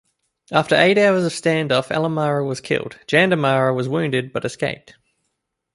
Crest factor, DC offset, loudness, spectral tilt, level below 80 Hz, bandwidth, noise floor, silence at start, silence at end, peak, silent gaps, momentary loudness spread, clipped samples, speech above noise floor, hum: 20 dB; under 0.1%; -19 LUFS; -5.5 dB/octave; -60 dBFS; 11.5 kHz; -75 dBFS; 0.5 s; 1 s; 0 dBFS; none; 9 LU; under 0.1%; 57 dB; none